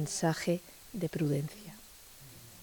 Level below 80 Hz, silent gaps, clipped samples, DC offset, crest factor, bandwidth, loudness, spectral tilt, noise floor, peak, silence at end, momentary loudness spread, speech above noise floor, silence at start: -64 dBFS; none; under 0.1%; under 0.1%; 18 dB; 19.5 kHz; -34 LUFS; -5.5 dB/octave; -54 dBFS; -18 dBFS; 0 s; 20 LU; 21 dB; 0 s